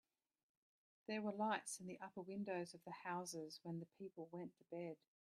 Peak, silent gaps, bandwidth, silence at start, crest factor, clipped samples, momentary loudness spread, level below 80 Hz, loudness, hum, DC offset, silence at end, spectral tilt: -28 dBFS; none; 13.5 kHz; 1.1 s; 22 dB; under 0.1%; 11 LU; under -90 dBFS; -49 LUFS; none; under 0.1%; 0.4 s; -4.5 dB/octave